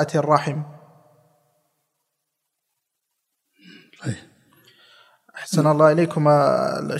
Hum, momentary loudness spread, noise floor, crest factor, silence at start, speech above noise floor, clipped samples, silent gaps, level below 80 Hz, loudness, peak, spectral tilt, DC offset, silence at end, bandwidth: none; 19 LU; -78 dBFS; 22 dB; 0 s; 60 dB; under 0.1%; none; -70 dBFS; -19 LUFS; -2 dBFS; -6.5 dB/octave; under 0.1%; 0 s; 13.5 kHz